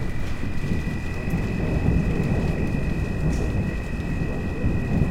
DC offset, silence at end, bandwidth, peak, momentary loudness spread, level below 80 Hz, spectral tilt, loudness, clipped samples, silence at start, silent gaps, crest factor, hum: under 0.1%; 0 s; 13 kHz; -6 dBFS; 6 LU; -28 dBFS; -8 dB/octave; -26 LUFS; under 0.1%; 0 s; none; 16 dB; none